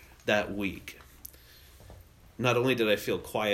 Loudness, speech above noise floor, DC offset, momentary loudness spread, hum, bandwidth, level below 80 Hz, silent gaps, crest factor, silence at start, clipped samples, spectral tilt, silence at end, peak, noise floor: -29 LUFS; 26 dB; under 0.1%; 21 LU; none; 16 kHz; -58 dBFS; none; 20 dB; 0 s; under 0.1%; -5 dB/octave; 0 s; -10 dBFS; -54 dBFS